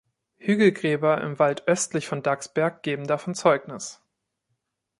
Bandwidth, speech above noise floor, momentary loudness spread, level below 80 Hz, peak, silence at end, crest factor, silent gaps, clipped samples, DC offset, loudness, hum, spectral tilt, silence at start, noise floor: 11.5 kHz; 54 dB; 10 LU; -70 dBFS; -4 dBFS; 1.05 s; 20 dB; none; under 0.1%; under 0.1%; -24 LUFS; none; -5 dB/octave; 0.45 s; -78 dBFS